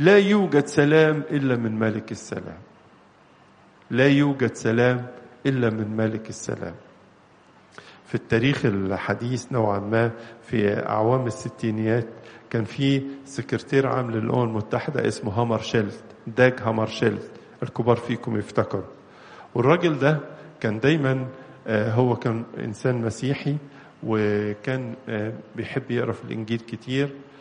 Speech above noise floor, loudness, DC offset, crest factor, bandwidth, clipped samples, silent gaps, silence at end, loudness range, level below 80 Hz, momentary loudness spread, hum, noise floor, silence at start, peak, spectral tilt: 31 dB; -24 LUFS; under 0.1%; 22 dB; 10 kHz; under 0.1%; none; 0.15 s; 4 LU; -60 dBFS; 13 LU; none; -54 dBFS; 0 s; -2 dBFS; -6.5 dB/octave